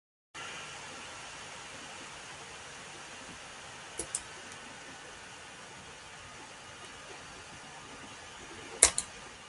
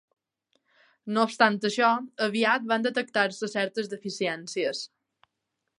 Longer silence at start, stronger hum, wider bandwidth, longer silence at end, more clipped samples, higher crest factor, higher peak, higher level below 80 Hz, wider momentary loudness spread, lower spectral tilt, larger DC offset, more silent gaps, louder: second, 0.35 s vs 1.05 s; neither; about the same, 11.5 kHz vs 11.5 kHz; second, 0 s vs 0.9 s; neither; first, 40 dB vs 22 dB; first, 0 dBFS vs -6 dBFS; first, -62 dBFS vs -80 dBFS; about the same, 10 LU vs 10 LU; second, 0 dB/octave vs -4 dB/octave; neither; neither; second, -37 LUFS vs -26 LUFS